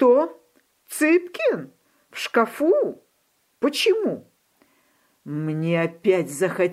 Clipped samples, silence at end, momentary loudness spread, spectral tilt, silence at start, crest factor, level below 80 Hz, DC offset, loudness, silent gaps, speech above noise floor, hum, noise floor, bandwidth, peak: under 0.1%; 0 s; 12 LU; -5 dB/octave; 0 s; 18 dB; -76 dBFS; under 0.1%; -22 LUFS; none; 46 dB; none; -67 dBFS; 16 kHz; -6 dBFS